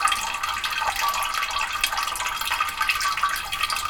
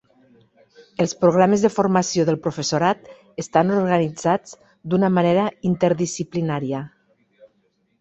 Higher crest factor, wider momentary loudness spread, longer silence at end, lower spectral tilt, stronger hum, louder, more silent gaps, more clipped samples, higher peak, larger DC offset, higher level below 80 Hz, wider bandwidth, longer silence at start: about the same, 20 dB vs 20 dB; second, 3 LU vs 12 LU; second, 0 s vs 1.1 s; second, 1 dB/octave vs -6 dB/octave; neither; second, -24 LUFS vs -20 LUFS; neither; neither; about the same, -4 dBFS vs -2 dBFS; neither; first, -48 dBFS vs -58 dBFS; first, over 20 kHz vs 8.2 kHz; second, 0 s vs 1 s